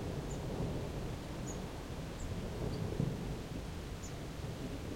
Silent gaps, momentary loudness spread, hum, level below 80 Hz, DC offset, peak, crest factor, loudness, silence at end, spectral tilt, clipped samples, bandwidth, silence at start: none; 6 LU; none; -48 dBFS; under 0.1%; -22 dBFS; 18 dB; -42 LUFS; 0 s; -6 dB/octave; under 0.1%; 16 kHz; 0 s